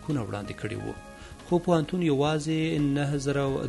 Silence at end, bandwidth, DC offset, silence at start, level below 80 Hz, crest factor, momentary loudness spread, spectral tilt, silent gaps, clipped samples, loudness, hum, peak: 0 s; 11.5 kHz; under 0.1%; 0 s; -50 dBFS; 16 dB; 13 LU; -6.5 dB/octave; none; under 0.1%; -27 LUFS; none; -10 dBFS